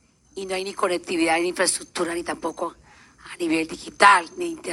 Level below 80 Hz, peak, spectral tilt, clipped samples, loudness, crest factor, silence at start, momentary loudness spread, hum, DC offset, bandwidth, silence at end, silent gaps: -60 dBFS; 0 dBFS; -2 dB/octave; under 0.1%; -22 LUFS; 24 dB; 0.35 s; 17 LU; none; under 0.1%; 15 kHz; 0 s; none